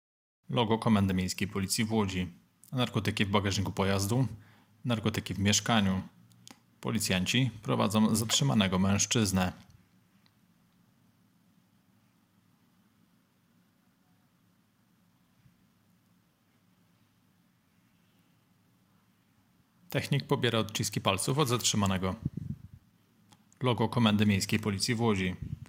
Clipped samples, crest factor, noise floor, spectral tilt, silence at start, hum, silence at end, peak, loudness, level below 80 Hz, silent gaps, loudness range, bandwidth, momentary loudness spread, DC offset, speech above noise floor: under 0.1%; 22 dB; -69 dBFS; -4.5 dB/octave; 0.5 s; none; 0.05 s; -10 dBFS; -29 LUFS; -64 dBFS; none; 6 LU; 16.5 kHz; 9 LU; under 0.1%; 40 dB